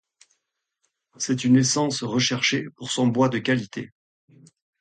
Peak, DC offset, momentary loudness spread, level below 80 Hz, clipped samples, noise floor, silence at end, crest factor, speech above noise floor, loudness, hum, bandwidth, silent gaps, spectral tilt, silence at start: -8 dBFS; under 0.1%; 13 LU; -66 dBFS; under 0.1%; -79 dBFS; 0.95 s; 16 dB; 56 dB; -22 LUFS; none; 9.4 kHz; none; -4 dB/octave; 1.2 s